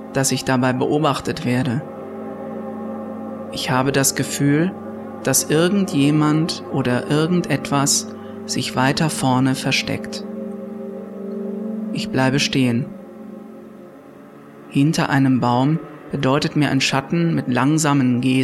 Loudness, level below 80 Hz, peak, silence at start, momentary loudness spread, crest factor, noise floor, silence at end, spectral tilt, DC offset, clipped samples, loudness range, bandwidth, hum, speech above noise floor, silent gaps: -19 LUFS; -54 dBFS; -4 dBFS; 0 s; 15 LU; 16 dB; -41 dBFS; 0 s; -4.5 dB/octave; under 0.1%; under 0.1%; 5 LU; 14.5 kHz; none; 23 dB; none